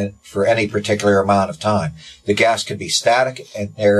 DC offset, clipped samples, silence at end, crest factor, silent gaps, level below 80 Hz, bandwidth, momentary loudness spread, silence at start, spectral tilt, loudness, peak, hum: under 0.1%; under 0.1%; 0 s; 14 dB; none; -46 dBFS; 13 kHz; 11 LU; 0 s; -4.5 dB/octave; -17 LUFS; -2 dBFS; none